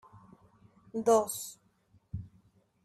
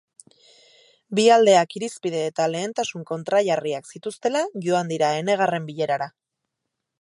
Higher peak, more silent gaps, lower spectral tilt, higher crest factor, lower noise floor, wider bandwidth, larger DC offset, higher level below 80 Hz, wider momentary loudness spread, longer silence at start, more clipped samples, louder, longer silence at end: second, -14 dBFS vs -4 dBFS; neither; about the same, -5 dB/octave vs -4.5 dB/octave; about the same, 22 dB vs 20 dB; second, -68 dBFS vs -81 dBFS; first, 14.5 kHz vs 11.5 kHz; neither; first, -62 dBFS vs -74 dBFS; first, 18 LU vs 12 LU; second, 0.15 s vs 1.1 s; neither; second, -30 LUFS vs -22 LUFS; second, 0.6 s vs 0.95 s